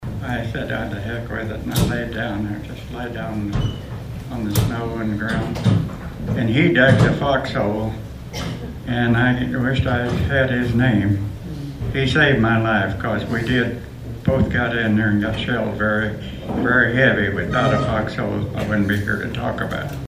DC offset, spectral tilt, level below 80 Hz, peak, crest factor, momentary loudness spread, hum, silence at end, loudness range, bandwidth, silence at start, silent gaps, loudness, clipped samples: under 0.1%; -6.5 dB/octave; -36 dBFS; 0 dBFS; 20 dB; 13 LU; none; 0 s; 6 LU; 15.5 kHz; 0 s; none; -20 LUFS; under 0.1%